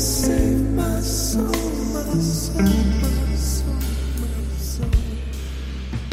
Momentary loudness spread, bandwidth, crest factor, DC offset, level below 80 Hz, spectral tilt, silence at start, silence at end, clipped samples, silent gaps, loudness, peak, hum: 10 LU; 16 kHz; 16 dB; under 0.1%; -24 dBFS; -5 dB/octave; 0 s; 0 s; under 0.1%; none; -22 LUFS; -6 dBFS; none